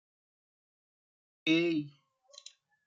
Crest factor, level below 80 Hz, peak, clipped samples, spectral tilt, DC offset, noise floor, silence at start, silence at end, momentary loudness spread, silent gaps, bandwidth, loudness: 22 dB; -84 dBFS; -16 dBFS; under 0.1%; -5 dB/octave; under 0.1%; -60 dBFS; 1.45 s; 0.95 s; 23 LU; none; 7.6 kHz; -31 LUFS